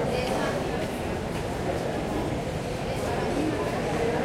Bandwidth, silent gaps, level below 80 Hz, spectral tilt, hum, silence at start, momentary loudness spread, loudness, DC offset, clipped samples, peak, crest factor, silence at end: 16.5 kHz; none; -42 dBFS; -5.5 dB/octave; none; 0 s; 4 LU; -29 LUFS; under 0.1%; under 0.1%; -14 dBFS; 14 dB; 0 s